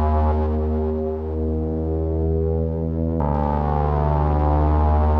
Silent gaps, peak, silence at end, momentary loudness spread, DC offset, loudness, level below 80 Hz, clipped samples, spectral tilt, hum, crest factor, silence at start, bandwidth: none; -6 dBFS; 0 s; 5 LU; under 0.1%; -22 LUFS; -24 dBFS; under 0.1%; -11.5 dB/octave; none; 14 dB; 0 s; 3.6 kHz